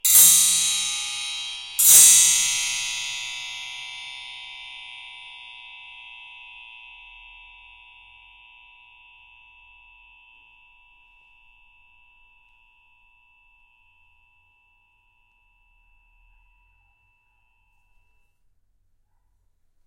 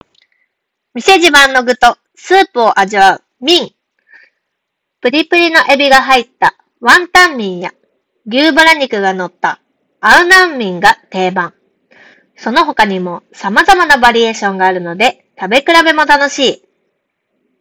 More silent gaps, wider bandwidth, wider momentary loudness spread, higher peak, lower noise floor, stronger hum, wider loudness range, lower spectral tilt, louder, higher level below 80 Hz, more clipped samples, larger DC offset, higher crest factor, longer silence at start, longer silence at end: neither; second, 16.5 kHz vs over 20 kHz; first, 30 LU vs 13 LU; about the same, -2 dBFS vs 0 dBFS; second, -65 dBFS vs -73 dBFS; neither; first, 27 LU vs 3 LU; second, 3.5 dB/octave vs -2.5 dB/octave; second, -16 LUFS vs -9 LUFS; second, -64 dBFS vs -42 dBFS; second, under 0.1% vs 3%; neither; first, 24 dB vs 12 dB; second, 0.05 s vs 0.95 s; first, 13.65 s vs 1.05 s